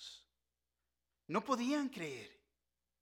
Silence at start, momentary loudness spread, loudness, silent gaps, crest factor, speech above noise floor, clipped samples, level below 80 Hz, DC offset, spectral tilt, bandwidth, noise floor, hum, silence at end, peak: 0 s; 20 LU; -39 LUFS; none; 22 dB; over 52 dB; under 0.1%; -82 dBFS; under 0.1%; -4.5 dB/octave; 17 kHz; under -90 dBFS; 60 Hz at -75 dBFS; 0.7 s; -22 dBFS